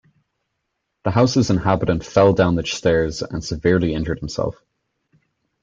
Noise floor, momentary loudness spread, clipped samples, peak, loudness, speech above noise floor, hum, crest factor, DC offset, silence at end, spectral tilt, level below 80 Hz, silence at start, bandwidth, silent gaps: -76 dBFS; 10 LU; under 0.1%; -2 dBFS; -19 LUFS; 58 dB; none; 18 dB; under 0.1%; 1.1 s; -6 dB/octave; -42 dBFS; 1.05 s; 7.8 kHz; none